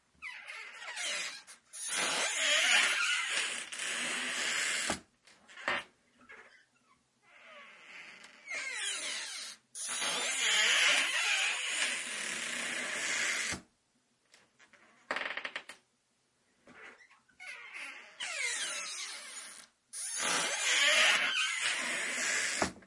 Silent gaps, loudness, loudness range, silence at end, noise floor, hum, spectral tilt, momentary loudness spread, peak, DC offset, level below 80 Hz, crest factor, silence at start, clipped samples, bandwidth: none; -31 LUFS; 14 LU; 0 s; -76 dBFS; none; 1 dB/octave; 20 LU; -14 dBFS; under 0.1%; -76 dBFS; 22 dB; 0.2 s; under 0.1%; 11.5 kHz